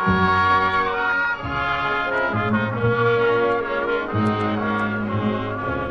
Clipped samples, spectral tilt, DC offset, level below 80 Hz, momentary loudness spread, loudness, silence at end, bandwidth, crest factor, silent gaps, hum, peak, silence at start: under 0.1%; -7.5 dB/octave; under 0.1%; -44 dBFS; 6 LU; -21 LUFS; 0 s; 7.8 kHz; 14 dB; none; none; -6 dBFS; 0 s